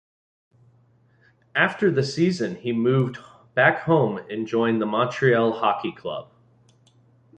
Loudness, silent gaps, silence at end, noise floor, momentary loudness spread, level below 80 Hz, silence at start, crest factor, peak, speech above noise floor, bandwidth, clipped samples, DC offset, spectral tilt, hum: -22 LUFS; none; 1.15 s; -59 dBFS; 11 LU; -64 dBFS; 1.55 s; 20 dB; -4 dBFS; 38 dB; 9.4 kHz; under 0.1%; under 0.1%; -6.5 dB/octave; none